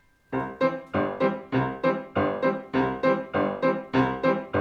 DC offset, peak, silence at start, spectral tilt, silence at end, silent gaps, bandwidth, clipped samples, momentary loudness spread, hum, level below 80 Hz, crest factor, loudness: under 0.1%; -10 dBFS; 0.3 s; -8.5 dB/octave; 0 s; none; 6.8 kHz; under 0.1%; 4 LU; none; -56 dBFS; 16 dB; -26 LUFS